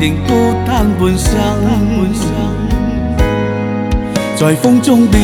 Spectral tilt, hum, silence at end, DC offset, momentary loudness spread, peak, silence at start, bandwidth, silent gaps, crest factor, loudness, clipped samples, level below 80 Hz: -6 dB/octave; none; 0 s; under 0.1%; 7 LU; 0 dBFS; 0 s; 18 kHz; none; 12 dB; -13 LUFS; under 0.1%; -20 dBFS